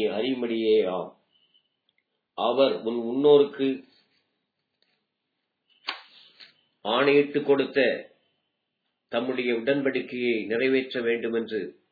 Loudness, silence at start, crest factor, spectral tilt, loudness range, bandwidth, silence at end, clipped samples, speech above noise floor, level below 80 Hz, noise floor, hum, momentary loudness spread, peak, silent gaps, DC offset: -25 LUFS; 0 s; 20 dB; -7.5 dB/octave; 4 LU; 4.9 kHz; 0.2 s; under 0.1%; 56 dB; -84 dBFS; -80 dBFS; none; 15 LU; -8 dBFS; none; under 0.1%